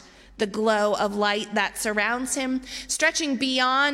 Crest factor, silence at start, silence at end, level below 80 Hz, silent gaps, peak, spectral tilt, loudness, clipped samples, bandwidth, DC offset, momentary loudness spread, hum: 16 dB; 0.4 s; 0 s; -56 dBFS; none; -8 dBFS; -2 dB/octave; -24 LUFS; under 0.1%; 16 kHz; under 0.1%; 7 LU; none